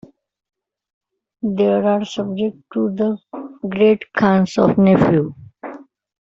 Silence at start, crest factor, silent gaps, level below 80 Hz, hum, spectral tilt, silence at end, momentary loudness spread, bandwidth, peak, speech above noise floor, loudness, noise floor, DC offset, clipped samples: 1.45 s; 16 dB; none; -52 dBFS; none; -8 dB/octave; 0.4 s; 18 LU; 7.6 kHz; -2 dBFS; 19 dB; -17 LUFS; -35 dBFS; under 0.1%; under 0.1%